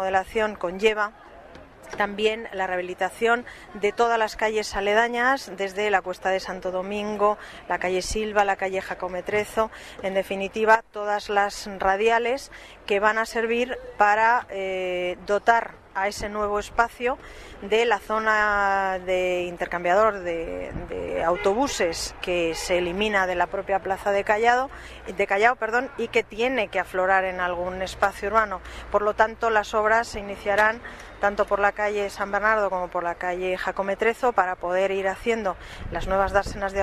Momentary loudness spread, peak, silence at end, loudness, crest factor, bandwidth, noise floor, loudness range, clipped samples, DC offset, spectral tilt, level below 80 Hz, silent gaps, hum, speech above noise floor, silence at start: 9 LU; -6 dBFS; 0 s; -24 LUFS; 20 dB; 14 kHz; -46 dBFS; 3 LU; under 0.1%; under 0.1%; -3.5 dB/octave; -46 dBFS; none; none; 21 dB; 0 s